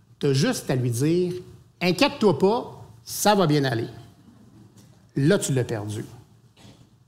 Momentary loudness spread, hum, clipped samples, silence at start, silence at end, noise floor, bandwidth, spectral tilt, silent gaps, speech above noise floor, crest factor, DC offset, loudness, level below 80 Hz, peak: 15 LU; none; under 0.1%; 0.2 s; 0.35 s; -52 dBFS; 16 kHz; -5.5 dB/octave; none; 30 dB; 20 dB; under 0.1%; -23 LUFS; -60 dBFS; -4 dBFS